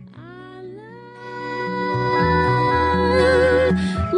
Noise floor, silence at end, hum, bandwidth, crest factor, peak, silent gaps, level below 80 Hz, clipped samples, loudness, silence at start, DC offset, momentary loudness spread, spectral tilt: -39 dBFS; 0 s; none; 10.5 kHz; 14 dB; -6 dBFS; none; -40 dBFS; under 0.1%; -18 LUFS; 0 s; under 0.1%; 22 LU; -7 dB/octave